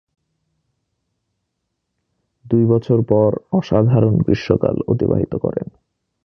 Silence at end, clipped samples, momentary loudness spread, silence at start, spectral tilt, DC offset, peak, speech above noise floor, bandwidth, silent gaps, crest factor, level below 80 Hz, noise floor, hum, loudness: 0.6 s; under 0.1%; 7 LU; 2.45 s; -10 dB/octave; under 0.1%; 0 dBFS; 59 dB; 6.4 kHz; none; 18 dB; -42 dBFS; -75 dBFS; none; -17 LUFS